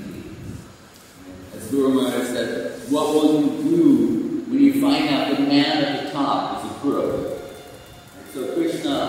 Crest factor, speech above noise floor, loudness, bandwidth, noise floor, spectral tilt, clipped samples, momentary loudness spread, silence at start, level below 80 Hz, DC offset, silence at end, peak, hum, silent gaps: 16 dB; 27 dB; -20 LUFS; 16 kHz; -45 dBFS; -5 dB/octave; under 0.1%; 21 LU; 0 s; -54 dBFS; under 0.1%; 0 s; -4 dBFS; none; none